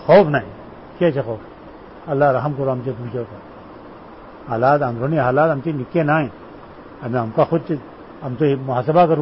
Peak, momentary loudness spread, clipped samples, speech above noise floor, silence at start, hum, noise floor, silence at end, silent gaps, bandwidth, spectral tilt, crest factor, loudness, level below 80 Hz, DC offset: -2 dBFS; 23 LU; under 0.1%; 21 dB; 0 s; none; -39 dBFS; 0 s; none; 5.8 kHz; -12.5 dB/octave; 18 dB; -19 LUFS; -50 dBFS; 0.1%